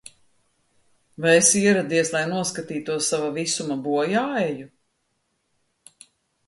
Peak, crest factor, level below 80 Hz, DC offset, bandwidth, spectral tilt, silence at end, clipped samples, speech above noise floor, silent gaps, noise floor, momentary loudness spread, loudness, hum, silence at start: -4 dBFS; 20 dB; -66 dBFS; under 0.1%; 11.5 kHz; -3 dB/octave; 1.8 s; under 0.1%; 51 dB; none; -72 dBFS; 12 LU; -21 LUFS; none; 1.2 s